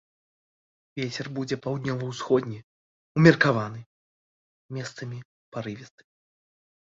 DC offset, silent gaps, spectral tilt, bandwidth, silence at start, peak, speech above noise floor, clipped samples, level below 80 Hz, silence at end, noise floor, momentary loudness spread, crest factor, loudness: under 0.1%; 2.64-3.15 s, 3.86-4.69 s, 5.25-5.52 s; -6.5 dB/octave; 7.8 kHz; 0.95 s; -2 dBFS; over 65 dB; under 0.1%; -62 dBFS; 0.95 s; under -90 dBFS; 22 LU; 26 dB; -26 LUFS